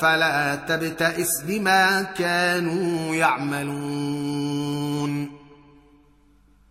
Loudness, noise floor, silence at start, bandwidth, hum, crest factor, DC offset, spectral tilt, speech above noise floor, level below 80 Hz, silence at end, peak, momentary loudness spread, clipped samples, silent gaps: -23 LUFS; -56 dBFS; 0 s; 16 kHz; none; 18 dB; under 0.1%; -4 dB/octave; 34 dB; -60 dBFS; 1.15 s; -6 dBFS; 9 LU; under 0.1%; none